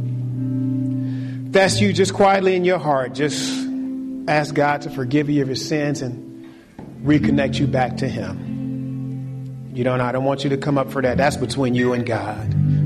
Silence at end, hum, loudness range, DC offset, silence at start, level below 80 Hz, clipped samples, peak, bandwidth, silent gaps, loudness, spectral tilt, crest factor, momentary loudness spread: 0 s; none; 4 LU; under 0.1%; 0 s; -48 dBFS; under 0.1%; -4 dBFS; 13 kHz; none; -20 LUFS; -6 dB/octave; 16 dB; 11 LU